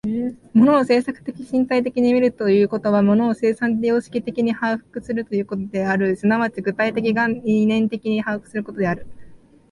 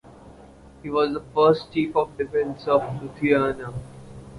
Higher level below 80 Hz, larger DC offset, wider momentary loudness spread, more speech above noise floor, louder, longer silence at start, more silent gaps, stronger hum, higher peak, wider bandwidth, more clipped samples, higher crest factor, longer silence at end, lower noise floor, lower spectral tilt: about the same, -56 dBFS vs -52 dBFS; neither; second, 9 LU vs 17 LU; about the same, 24 dB vs 24 dB; first, -20 LUFS vs -23 LUFS; about the same, 0.05 s vs 0.05 s; neither; neither; about the same, -4 dBFS vs -6 dBFS; about the same, 11 kHz vs 11 kHz; neither; about the same, 14 dB vs 18 dB; first, 0.35 s vs 0 s; second, -43 dBFS vs -47 dBFS; about the same, -7.5 dB/octave vs -7.5 dB/octave